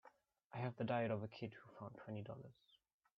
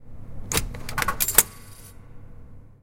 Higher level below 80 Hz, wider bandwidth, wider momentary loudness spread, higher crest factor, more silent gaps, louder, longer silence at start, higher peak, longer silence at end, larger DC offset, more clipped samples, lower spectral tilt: second, -84 dBFS vs -40 dBFS; second, 6 kHz vs 17 kHz; second, 15 LU vs 26 LU; second, 20 dB vs 28 dB; first, 0.44-0.50 s vs none; second, -47 LUFS vs -22 LUFS; about the same, 0.05 s vs 0 s; second, -28 dBFS vs 0 dBFS; first, 0.65 s vs 0.1 s; neither; neither; first, -6 dB/octave vs -1.5 dB/octave